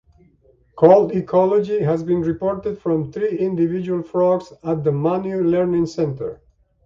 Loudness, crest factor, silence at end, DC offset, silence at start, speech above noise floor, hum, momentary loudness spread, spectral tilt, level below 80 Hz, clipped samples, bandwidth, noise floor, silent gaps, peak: -19 LUFS; 18 dB; 0.5 s; under 0.1%; 0.75 s; 38 dB; none; 9 LU; -9 dB/octave; -52 dBFS; under 0.1%; 7.4 kHz; -56 dBFS; none; 0 dBFS